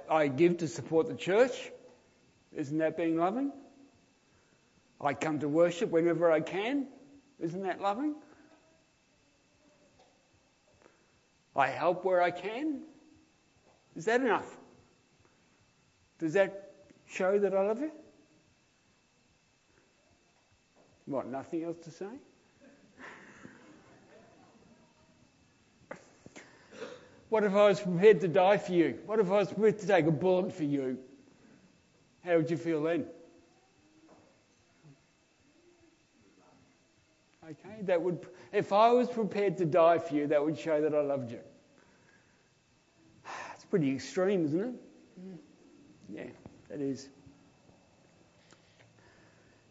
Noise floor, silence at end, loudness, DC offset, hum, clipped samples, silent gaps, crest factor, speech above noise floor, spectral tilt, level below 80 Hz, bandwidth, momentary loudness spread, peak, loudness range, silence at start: -69 dBFS; 2.6 s; -30 LUFS; under 0.1%; none; under 0.1%; none; 22 dB; 40 dB; -6.5 dB/octave; -78 dBFS; 8 kHz; 24 LU; -10 dBFS; 17 LU; 0 s